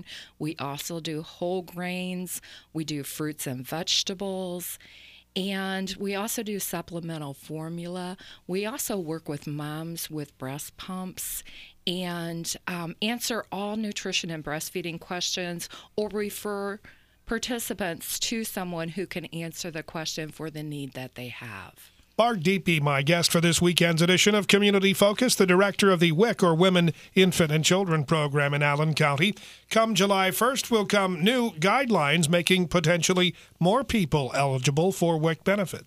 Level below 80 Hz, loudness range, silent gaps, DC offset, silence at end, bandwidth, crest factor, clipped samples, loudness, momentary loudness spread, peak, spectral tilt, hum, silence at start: -56 dBFS; 12 LU; none; under 0.1%; 0.05 s; 15.5 kHz; 24 dB; under 0.1%; -26 LUFS; 15 LU; -2 dBFS; -4.5 dB/octave; none; 0.05 s